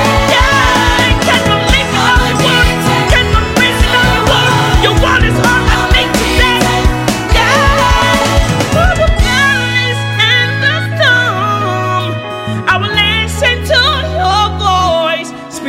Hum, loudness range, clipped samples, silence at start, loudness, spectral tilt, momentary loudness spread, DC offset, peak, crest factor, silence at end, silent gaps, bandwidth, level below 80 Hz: none; 2 LU; under 0.1%; 0 s; -10 LUFS; -4 dB/octave; 5 LU; under 0.1%; 0 dBFS; 10 dB; 0 s; none; 17 kHz; -18 dBFS